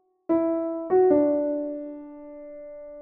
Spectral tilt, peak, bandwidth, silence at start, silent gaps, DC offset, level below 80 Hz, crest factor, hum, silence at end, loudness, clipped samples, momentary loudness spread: -9 dB/octave; -8 dBFS; 2.8 kHz; 0.3 s; none; under 0.1%; -64 dBFS; 16 dB; none; 0 s; -24 LUFS; under 0.1%; 21 LU